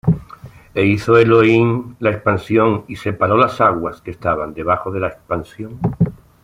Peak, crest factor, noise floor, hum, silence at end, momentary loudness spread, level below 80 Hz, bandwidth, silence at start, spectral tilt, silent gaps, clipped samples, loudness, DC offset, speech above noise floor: -2 dBFS; 14 dB; -39 dBFS; none; 0.3 s; 13 LU; -44 dBFS; 11.5 kHz; 0.05 s; -8 dB/octave; none; under 0.1%; -17 LUFS; under 0.1%; 23 dB